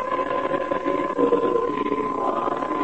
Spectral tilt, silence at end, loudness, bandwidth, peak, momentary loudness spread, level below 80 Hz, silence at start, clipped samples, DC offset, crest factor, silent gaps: -6.5 dB/octave; 0 s; -23 LUFS; 8.6 kHz; -6 dBFS; 4 LU; -54 dBFS; 0 s; under 0.1%; 0.5%; 16 dB; none